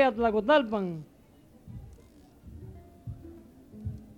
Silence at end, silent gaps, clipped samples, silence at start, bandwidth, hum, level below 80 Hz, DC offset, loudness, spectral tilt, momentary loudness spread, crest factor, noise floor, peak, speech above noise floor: 0.05 s; none; under 0.1%; 0 s; 12 kHz; none; -54 dBFS; under 0.1%; -27 LUFS; -7 dB/octave; 27 LU; 20 dB; -57 dBFS; -10 dBFS; 31 dB